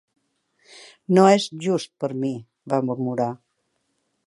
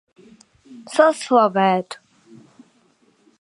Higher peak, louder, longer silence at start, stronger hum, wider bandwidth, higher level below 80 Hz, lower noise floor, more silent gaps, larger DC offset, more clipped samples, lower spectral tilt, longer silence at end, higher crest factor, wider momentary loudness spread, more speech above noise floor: about the same, -2 dBFS vs -2 dBFS; second, -22 LUFS vs -18 LUFS; about the same, 0.75 s vs 0.7 s; neither; about the same, 11.5 kHz vs 11.5 kHz; about the same, -74 dBFS vs -74 dBFS; first, -73 dBFS vs -60 dBFS; neither; neither; neither; about the same, -6 dB/octave vs -5 dB/octave; second, 0.9 s vs 1.45 s; about the same, 22 dB vs 20 dB; about the same, 16 LU vs 17 LU; first, 52 dB vs 42 dB